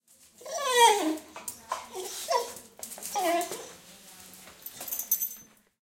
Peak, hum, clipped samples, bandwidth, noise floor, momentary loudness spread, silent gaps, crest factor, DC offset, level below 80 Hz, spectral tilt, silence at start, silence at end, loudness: -8 dBFS; none; under 0.1%; 17 kHz; -51 dBFS; 26 LU; none; 22 dB; under 0.1%; -74 dBFS; -0.5 dB/octave; 0.4 s; 0.55 s; -28 LUFS